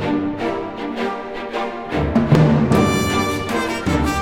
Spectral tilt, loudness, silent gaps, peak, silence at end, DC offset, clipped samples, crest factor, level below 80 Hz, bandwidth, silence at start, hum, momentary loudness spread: -6 dB/octave; -19 LUFS; none; -2 dBFS; 0 s; under 0.1%; under 0.1%; 16 dB; -34 dBFS; 17.5 kHz; 0 s; none; 11 LU